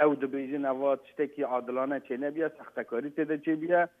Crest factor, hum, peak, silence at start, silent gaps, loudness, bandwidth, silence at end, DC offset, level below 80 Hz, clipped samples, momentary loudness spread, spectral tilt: 20 dB; none; -10 dBFS; 0 s; none; -31 LUFS; 3.8 kHz; 0.1 s; under 0.1%; -84 dBFS; under 0.1%; 7 LU; -8.5 dB/octave